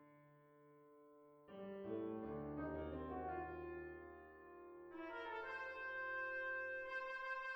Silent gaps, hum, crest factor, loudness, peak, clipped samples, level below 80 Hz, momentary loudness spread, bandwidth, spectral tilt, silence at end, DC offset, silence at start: none; none; 14 dB; -48 LUFS; -36 dBFS; under 0.1%; -68 dBFS; 22 LU; over 20 kHz; -7 dB/octave; 0 s; under 0.1%; 0 s